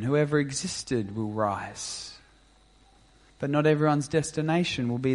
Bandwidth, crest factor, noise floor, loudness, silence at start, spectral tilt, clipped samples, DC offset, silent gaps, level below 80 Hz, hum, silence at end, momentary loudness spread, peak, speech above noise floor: 11.5 kHz; 18 dB; -59 dBFS; -27 LUFS; 0 s; -5.5 dB/octave; under 0.1%; under 0.1%; none; -58 dBFS; none; 0 s; 11 LU; -10 dBFS; 32 dB